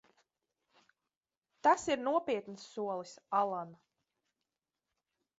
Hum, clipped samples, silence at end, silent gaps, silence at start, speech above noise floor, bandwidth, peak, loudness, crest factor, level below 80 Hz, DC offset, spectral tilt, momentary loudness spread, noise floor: none; under 0.1%; 1.65 s; none; 1.65 s; over 56 dB; 7.6 kHz; -14 dBFS; -34 LUFS; 24 dB; -78 dBFS; under 0.1%; -3 dB/octave; 13 LU; under -90 dBFS